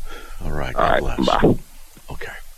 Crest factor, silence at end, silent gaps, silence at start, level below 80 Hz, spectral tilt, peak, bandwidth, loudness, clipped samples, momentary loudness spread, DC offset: 18 dB; 0.05 s; none; 0 s; -28 dBFS; -6 dB/octave; -4 dBFS; 14.5 kHz; -20 LUFS; under 0.1%; 18 LU; under 0.1%